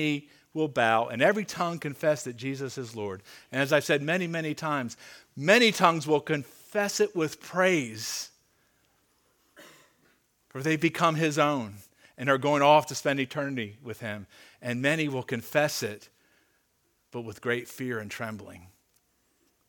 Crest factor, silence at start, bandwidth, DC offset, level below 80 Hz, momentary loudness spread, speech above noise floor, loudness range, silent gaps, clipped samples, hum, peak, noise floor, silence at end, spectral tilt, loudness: 24 dB; 0 s; 18.5 kHz; under 0.1%; -74 dBFS; 16 LU; 44 dB; 8 LU; none; under 0.1%; none; -4 dBFS; -72 dBFS; 1 s; -4.5 dB/octave; -27 LUFS